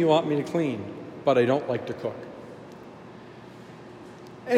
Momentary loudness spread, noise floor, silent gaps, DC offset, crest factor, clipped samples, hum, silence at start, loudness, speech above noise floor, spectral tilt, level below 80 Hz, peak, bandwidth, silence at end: 23 LU; -45 dBFS; none; under 0.1%; 20 dB; under 0.1%; none; 0 s; -26 LUFS; 20 dB; -7 dB/octave; -70 dBFS; -8 dBFS; 13.5 kHz; 0 s